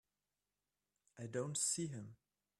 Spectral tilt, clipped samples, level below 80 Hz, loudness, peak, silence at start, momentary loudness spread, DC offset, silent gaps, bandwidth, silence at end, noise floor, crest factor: -3.5 dB/octave; under 0.1%; -82 dBFS; -40 LUFS; -26 dBFS; 1.15 s; 16 LU; under 0.1%; none; 14.5 kHz; 0.45 s; under -90 dBFS; 20 dB